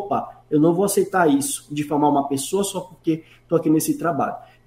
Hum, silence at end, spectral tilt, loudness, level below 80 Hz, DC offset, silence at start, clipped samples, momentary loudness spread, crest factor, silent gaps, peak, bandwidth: none; 0.2 s; -5 dB/octave; -21 LUFS; -58 dBFS; under 0.1%; 0 s; under 0.1%; 8 LU; 16 dB; none; -6 dBFS; 16 kHz